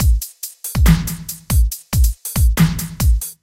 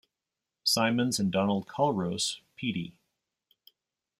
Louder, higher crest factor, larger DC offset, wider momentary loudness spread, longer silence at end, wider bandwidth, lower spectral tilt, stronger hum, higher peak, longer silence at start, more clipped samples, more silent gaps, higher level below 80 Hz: first, -18 LUFS vs -29 LUFS; about the same, 16 dB vs 20 dB; neither; about the same, 10 LU vs 9 LU; second, 0.1 s vs 1.3 s; about the same, 17 kHz vs 16 kHz; about the same, -5 dB/octave vs -4 dB/octave; neither; first, 0 dBFS vs -12 dBFS; second, 0 s vs 0.65 s; neither; neither; first, -18 dBFS vs -70 dBFS